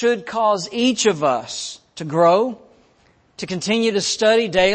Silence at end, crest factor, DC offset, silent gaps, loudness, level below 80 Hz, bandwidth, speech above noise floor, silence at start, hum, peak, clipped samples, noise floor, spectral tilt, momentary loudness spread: 0 s; 16 dB; under 0.1%; none; -19 LUFS; -54 dBFS; 8.8 kHz; 39 dB; 0 s; none; -4 dBFS; under 0.1%; -57 dBFS; -3.5 dB/octave; 13 LU